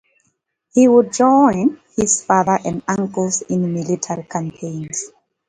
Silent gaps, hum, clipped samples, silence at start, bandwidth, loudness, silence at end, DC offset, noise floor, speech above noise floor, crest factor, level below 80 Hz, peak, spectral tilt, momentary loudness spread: none; none; under 0.1%; 0.75 s; 9.6 kHz; -17 LUFS; 0.4 s; under 0.1%; -68 dBFS; 52 dB; 18 dB; -54 dBFS; 0 dBFS; -5.5 dB/octave; 14 LU